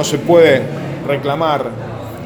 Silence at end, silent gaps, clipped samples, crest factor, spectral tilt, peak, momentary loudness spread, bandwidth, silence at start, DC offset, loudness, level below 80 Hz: 0 s; none; under 0.1%; 14 dB; -5.5 dB/octave; 0 dBFS; 15 LU; over 20 kHz; 0 s; under 0.1%; -14 LUFS; -48 dBFS